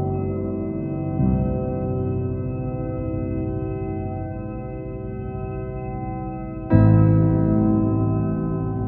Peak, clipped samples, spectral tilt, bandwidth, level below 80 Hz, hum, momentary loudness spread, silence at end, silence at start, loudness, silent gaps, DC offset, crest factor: -2 dBFS; under 0.1%; -14.5 dB/octave; 2.8 kHz; -34 dBFS; none; 13 LU; 0 s; 0 s; -23 LUFS; none; under 0.1%; 20 dB